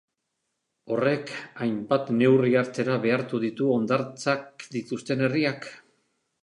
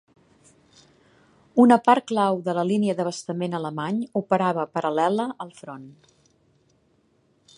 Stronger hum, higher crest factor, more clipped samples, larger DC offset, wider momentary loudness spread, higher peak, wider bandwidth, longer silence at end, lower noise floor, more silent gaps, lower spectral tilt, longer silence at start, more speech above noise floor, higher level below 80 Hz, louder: neither; about the same, 18 dB vs 22 dB; neither; neither; second, 12 LU vs 17 LU; second, -8 dBFS vs -2 dBFS; about the same, 11 kHz vs 11 kHz; second, 0.65 s vs 1.65 s; first, -80 dBFS vs -64 dBFS; neither; about the same, -6.5 dB/octave vs -6.5 dB/octave; second, 0.85 s vs 1.55 s; first, 55 dB vs 42 dB; about the same, -72 dBFS vs -72 dBFS; about the same, -25 LUFS vs -23 LUFS